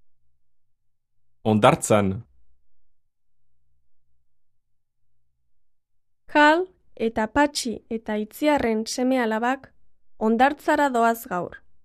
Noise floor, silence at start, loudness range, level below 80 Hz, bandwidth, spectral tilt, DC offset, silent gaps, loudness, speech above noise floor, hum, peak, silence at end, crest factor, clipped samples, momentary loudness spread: -66 dBFS; 1.45 s; 3 LU; -56 dBFS; 14 kHz; -5 dB/octave; under 0.1%; none; -22 LUFS; 44 dB; none; 0 dBFS; 0.3 s; 24 dB; under 0.1%; 12 LU